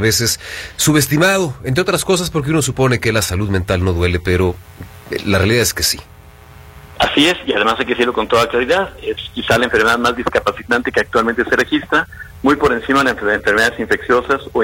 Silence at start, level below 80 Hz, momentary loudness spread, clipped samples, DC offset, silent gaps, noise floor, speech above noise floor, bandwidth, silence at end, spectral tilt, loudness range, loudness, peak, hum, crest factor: 0 s; -36 dBFS; 6 LU; under 0.1%; under 0.1%; none; -40 dBFS; 24 dB; 16.5 kHz; 0 s; -4 dB/octave; 2 LU; -15 LUFS; 0 dBFS; none; 16 dB